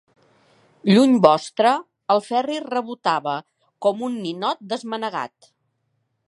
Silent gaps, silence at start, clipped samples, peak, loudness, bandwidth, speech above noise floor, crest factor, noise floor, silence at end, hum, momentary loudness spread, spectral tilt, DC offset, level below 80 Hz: none; 0.85 s; under 0.1%; 0 dBFS; -21 LUFS; 11.5 kHz; 52 dB; 22 dB; -72 dBFS; 1.05 s; none; 13 LU; -6 dB/octave; under 0.1%; -72 dBFS